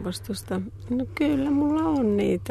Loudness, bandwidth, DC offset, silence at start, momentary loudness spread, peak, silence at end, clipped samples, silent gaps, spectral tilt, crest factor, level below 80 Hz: -25 LUFS; 13.5 kHz; under 0.1%; 0 s; 9 LU; -12 dBFS; 0 s; under 0.1%; none; -6.5 dB/octave; 12 dB; -48 dBFS